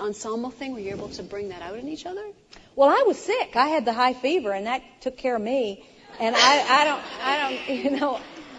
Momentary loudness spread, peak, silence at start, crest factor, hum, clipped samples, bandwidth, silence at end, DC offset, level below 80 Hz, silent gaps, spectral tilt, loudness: 16 LU; -4 dBFS; 0 s; 20 dB; none; under 0.1%; 10.5 kHz; 0 s; under 0.1%; -60 dBFS; none; -2.5 dB/octave; -23 LUFS